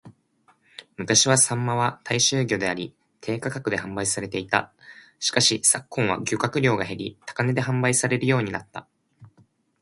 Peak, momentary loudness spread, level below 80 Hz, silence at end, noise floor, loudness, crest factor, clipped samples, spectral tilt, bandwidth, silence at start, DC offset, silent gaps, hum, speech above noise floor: -2 dBFS; 16 LU; -58 dBFS; 0.55 s; -63 dBFS; -22 LUFS; 22 dB; under 0.1%; -3 dB/octave; 11.5 kHz; 0.05 s; under 0.1%; none; none; 39 dB